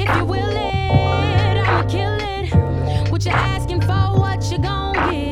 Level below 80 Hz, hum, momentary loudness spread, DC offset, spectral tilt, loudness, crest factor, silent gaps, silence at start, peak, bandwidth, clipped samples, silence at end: -28 dBFS; none; 4 LU; under 0.1%; -6.5 dB/octave; -18 LUFS; 16 dB; none; 0 s; -2 dBFS; 11 kHz; under 0.1%; 0 s